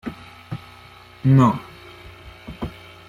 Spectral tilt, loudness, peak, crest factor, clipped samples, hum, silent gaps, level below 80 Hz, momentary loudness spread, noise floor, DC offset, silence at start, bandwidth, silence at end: -8.5 dB/octave; -19 LUFS; -4 dBFS; 18 dB; under 0.1%; none; none; -48 dBFS; 26 LU; -45 dBFS; under 0.1%; 0.05 s; 7.4 kHz; 0.35 s